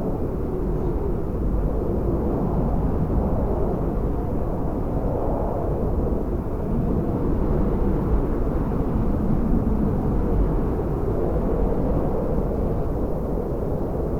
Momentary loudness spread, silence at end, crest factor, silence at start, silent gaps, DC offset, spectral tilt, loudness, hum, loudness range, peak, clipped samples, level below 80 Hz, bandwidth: 3 LU; 0 s; 12 dB; 0 s; none; under 0.1%; -11 dB/octave; -25 LUFS; none; 2 LU; -8 dBFS; under 0.1%; -26 dBFS; 13.5 kHz